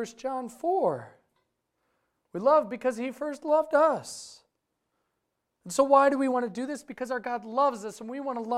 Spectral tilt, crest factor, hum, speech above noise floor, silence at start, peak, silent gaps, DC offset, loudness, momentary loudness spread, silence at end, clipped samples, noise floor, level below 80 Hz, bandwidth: -4.5 dB/octave; 20 dB; none; 54 dB; 0 s; -8 dBFS; none; under 0.1%; -27 LUFS; 15 LU; 0 s; under 0.1%; -81 dBFS; -72 dBFS; 14 kHz